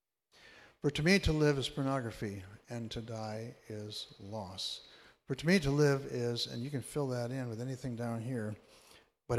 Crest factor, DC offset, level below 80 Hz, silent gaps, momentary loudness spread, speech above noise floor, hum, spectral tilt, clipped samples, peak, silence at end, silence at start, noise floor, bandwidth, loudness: 20 dB; under 0.1%; -54 dBFS; none; 16 LU; 29 dB; none; -5.5 dB/octave; under 0.1%; -14 dBFS; 0 s; 0.45 s; -63 dBFS; 14.5 kHz; -35 LUFS